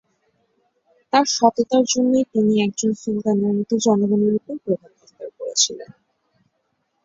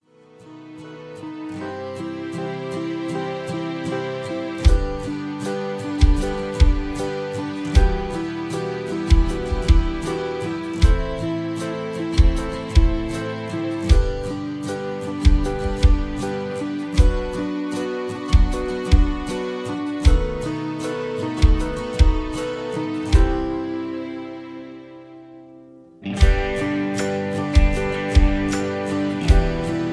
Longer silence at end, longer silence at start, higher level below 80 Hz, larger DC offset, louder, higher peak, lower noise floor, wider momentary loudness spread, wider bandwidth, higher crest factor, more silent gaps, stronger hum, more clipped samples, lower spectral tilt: first, 1.2 s vs 0 s; first, 1.15 s vs 0.4 s; second, -64 dBFS vs -22 dBFS; neither; first, -19 LUFS vs -23 LUFS; about the same, -2 dBFS vs -2 dBFS; first, -71 dBFS vs -48 dBFS; about the same, 9 LU vs 11 LU; second, 7.8 kHz vs 11 kHz; about the same, 18 dB vs 18 dB; neither; neither; neither; second, -4 dB/octave vs -6.5 dB/octave